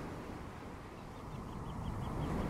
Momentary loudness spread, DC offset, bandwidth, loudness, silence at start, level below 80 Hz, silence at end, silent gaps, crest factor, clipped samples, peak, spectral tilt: 8 LU; under 0.1%; 16 kHz; -45 LUFS; 0 s; -50 dBFS; 0 s; none; 16 dB; under 0.1%; -26 dBFS; -7 dB/octave